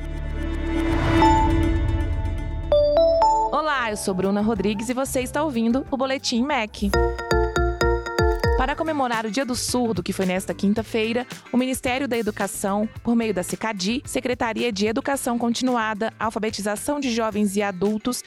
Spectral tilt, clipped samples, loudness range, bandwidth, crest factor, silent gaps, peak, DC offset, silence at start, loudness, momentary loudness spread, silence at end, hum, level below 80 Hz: -5 dB/octave; under 0.1%; 4 LU; 16.5 kHz; 14 dB; none; -8 dBFS; under 0.1%; 0 s; -23 LUFS; 7 LU; 0.05 s; none; -32 dBFS